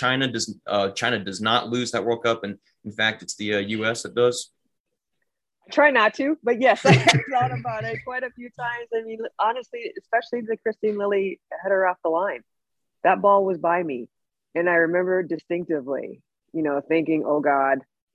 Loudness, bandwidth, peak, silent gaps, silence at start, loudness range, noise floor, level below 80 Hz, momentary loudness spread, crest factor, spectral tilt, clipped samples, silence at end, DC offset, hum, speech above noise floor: -23 LUFS; 12 kHz; 0 dBFS; 4.80-4.84 s; 0 s; 6 LU; -83 dBFS; -64 dBFS; 13 LU; 22 dB; -4.5 dB/octave; under 0.1%; 0.35 s; under 0.1%; none; 61 dB